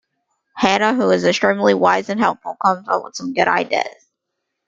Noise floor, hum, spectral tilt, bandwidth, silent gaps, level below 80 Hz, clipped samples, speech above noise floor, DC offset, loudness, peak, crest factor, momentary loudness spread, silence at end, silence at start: -77 dBFS; none; -4.5 dB/octave; 9.2 kHz; none; -62 dBFS; under 0.1%; 60 dB; under 0.1%; -17 LUFS; -2 dBFS; 18 dB; 7 LU; 0.75 s; 0.55 s